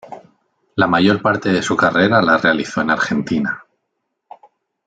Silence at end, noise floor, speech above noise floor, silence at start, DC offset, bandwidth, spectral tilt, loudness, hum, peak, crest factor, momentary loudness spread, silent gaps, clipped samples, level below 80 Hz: 1.25 s; -74 dBFS; 59 dB; 0.1 s; under 0.1%; 9.2 kHz; -5.5 dB/octave; -16 LUFS; none; -2 dBFS; 16 dB; 8 LU; none; under 0.1%; -56 dBFS